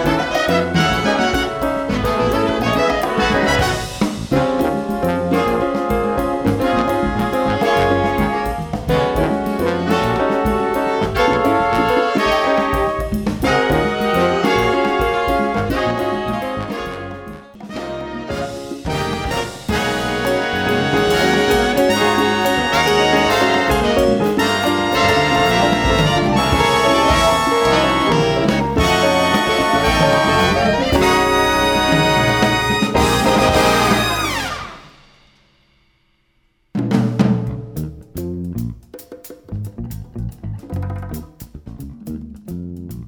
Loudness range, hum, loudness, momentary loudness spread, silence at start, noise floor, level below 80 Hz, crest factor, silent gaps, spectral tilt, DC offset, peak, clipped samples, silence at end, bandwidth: 10 LU; none; -16 LUFS; 15 LU; 0 s; -61 dBFS; -32 dBFS; 16 dB; none; -5 dB/octave; under 0.1%; 0 dBFS; under 0.1%; 0 s; over 20 kHz